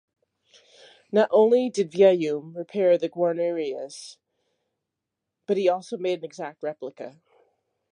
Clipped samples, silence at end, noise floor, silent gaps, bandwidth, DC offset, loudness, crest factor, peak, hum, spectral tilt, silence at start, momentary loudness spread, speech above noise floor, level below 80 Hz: under 0.1%; 0.85 s; -84 dBFS; none; 10.5 kHz; under 0.1%; -24 LUFS; 20 dB; -6 dBFS; none; -6 dB/octave; 1.15 s; 19 LU; 61 dB; -82 dBFS